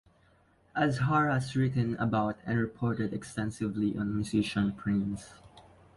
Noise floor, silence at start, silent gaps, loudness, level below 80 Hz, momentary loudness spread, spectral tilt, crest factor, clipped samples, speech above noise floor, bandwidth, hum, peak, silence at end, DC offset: -65 dBFS; 0.75 s; none; -31 LUFS; -56 dBFS; 8 LU; -7 dB/octave; 18 dB; under 0.1%; 35 dB; 11.5 kHz; none; -14 dBFS; 0.35 s; under 0.1%